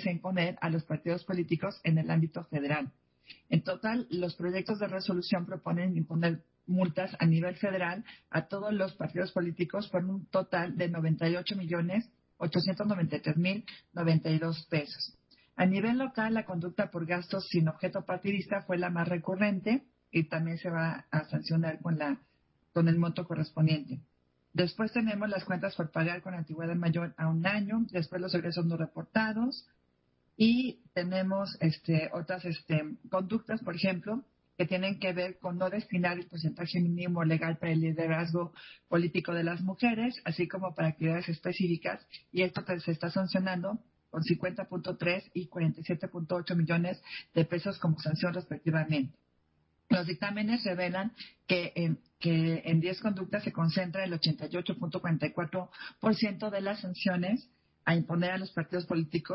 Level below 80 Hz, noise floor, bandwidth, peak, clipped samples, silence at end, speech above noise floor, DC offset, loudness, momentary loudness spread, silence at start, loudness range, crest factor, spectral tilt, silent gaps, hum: -68 dBFS; -73 dBFS; 5.8 kHz; -14 dBFS; under 0.1%; 0 s; 42 dB; under 0.1%; -32 LUFS; 7 LU; 0 s; 2 LU; 18 dB; -10.5 dB/octave; none; none